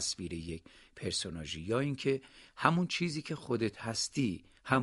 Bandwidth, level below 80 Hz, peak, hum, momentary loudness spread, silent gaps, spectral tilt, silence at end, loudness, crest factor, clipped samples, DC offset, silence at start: 11.5 kHz; -60 dBFS; -8 dBFS; none; 12 LU; none; -4.5 dB/octave; 0 s; -35 LUFS; 26 dB; under 0.1%; under 0.1%; 0 s